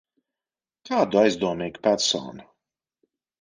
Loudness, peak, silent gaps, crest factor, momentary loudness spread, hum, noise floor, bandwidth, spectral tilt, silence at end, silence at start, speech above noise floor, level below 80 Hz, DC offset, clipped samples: -23 LUFS; -6 dBFS; none; 20 dB; 8 LU; none; under -90 dBFS; 10 kHz; -3.5 dB/octave; 1 s; 0.85 s; over 67 dB; -64 dBFS; under 0.1%; under 0.1%